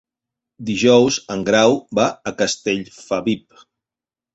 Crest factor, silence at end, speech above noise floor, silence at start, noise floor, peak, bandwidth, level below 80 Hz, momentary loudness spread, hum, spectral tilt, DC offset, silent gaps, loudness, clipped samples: 18 dB; 0.95 s; 72 dB; 0.6 s; -89 dBFS; -2 dBFS; 8.2 kHz; -56 dBFS; 11 LU; none; -4 dB/octave; under 0.1%; none; -18 LUFS; under 0.1%